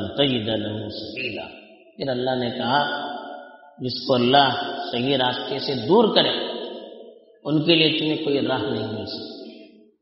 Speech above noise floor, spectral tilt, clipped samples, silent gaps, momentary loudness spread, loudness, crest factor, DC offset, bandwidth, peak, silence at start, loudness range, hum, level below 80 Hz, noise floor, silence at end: 25 dB; -3 dB/octave; under 0.1%; none; 18 LU; -22 LUFS; 22 dB; under 0.1%; 6 kHz; -2 dBFS; 0 s; 6 LU; none; -60 dBFS; -47 dBFS; 0.35 s